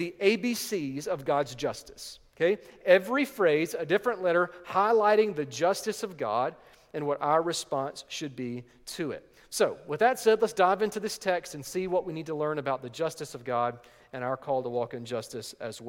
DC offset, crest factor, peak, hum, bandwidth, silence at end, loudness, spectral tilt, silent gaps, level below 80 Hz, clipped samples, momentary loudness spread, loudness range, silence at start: under 0.1%; 22 dB; -6 dBFS; none; 17 kHz; 0 s; -29 LUFS; -4.5 dB/octave; none; -68 dBFS; under 0.1%; 13 LU; 6 LU; 0 s